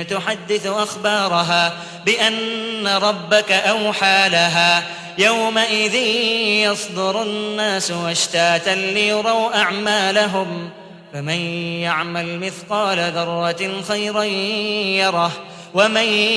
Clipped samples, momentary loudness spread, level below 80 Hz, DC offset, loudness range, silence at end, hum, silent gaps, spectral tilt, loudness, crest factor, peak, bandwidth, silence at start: under 0.1%; 9 LU; -64 dBFS; under 0.1%; 6 LU; 0 s; none; none; -3 dB/octave; -17 LUFS; 16 dB; -2 dBFS; 11 kHz; 0 s